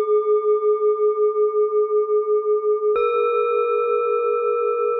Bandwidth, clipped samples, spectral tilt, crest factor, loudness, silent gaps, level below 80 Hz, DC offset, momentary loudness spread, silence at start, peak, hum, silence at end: 3.9 kHz; under 0.1%; -7 dB/octave; 8 dB; -20 LUFS; none; -70 dBFS; under 0.1%; 2 LU; 0 s; -10 dBFS; none; 0 s